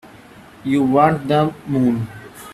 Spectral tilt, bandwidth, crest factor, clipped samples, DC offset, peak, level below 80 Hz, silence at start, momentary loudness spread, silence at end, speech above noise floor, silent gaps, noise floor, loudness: -7.5 dB/octave; 13.5 kHz; 18 dB; under 0.1%; under 0.1%; -2 dBFS; -52 dBFS; 0.65 s; 16 LU; 0 s; 26 dB; none; -43 dBFS; -17 LUFS